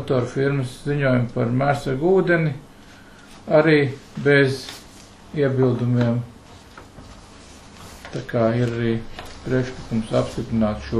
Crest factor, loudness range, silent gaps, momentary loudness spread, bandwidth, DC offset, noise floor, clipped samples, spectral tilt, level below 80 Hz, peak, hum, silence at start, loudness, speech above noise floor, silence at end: 18 dB; 6 LU; none; 18 LU; 12.5 kHz; under 0.1%; -45 dBFS; under 0.1%; -7 dB/octave; -44 dBFS; -4 dBFS; none; 0 s; -21 LUFS; 25 dB; 0 s